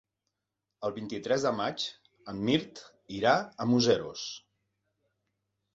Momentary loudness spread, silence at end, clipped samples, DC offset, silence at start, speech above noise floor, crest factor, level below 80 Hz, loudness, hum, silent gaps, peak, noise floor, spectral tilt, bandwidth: 17 LU; 1.35 s; under 0.1%; under 0.1%; 0.8 s; 57 dB; 22 dB; -68 dBFS; -30 LUFS; none; none; -10 dBFS; -86 dBFS; -5 dB/octave; 7.8 kHz